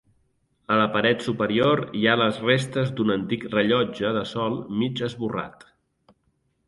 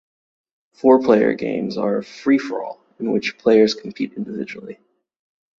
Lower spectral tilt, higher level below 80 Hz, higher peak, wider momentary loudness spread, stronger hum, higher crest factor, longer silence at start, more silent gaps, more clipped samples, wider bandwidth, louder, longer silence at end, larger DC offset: about the same, -6 dB/octave vs -6 dB/octave; first, -58 dBFS vs -64 dBFS; about the same, -4 dBFS vs -2 dBFS; second, 8 LU vs 15 LU; neither; about the same, 20 dB vs 18 dB; second, 0.7 s vs 0.85 s; neither; neither; first, 11.5 kHz vs 7.4 kHz; second, -23 LUFS vs -19 LUFS; first, 1.15 s vs 0.85 s; neither